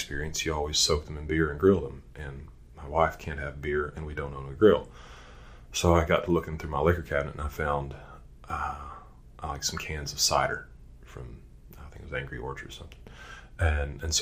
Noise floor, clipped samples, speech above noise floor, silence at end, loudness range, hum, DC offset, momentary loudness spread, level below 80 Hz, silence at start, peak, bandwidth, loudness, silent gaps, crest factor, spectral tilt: -48 dBFS; under 0.1%; 20 dB; 0 s; 6 LU; none; under 0.1%; 22 LU; -40 dBFS; 0 s; -6 dBFS; 15.5 kHz; -28 LUFS; none; 24 dB; -4 dB/octave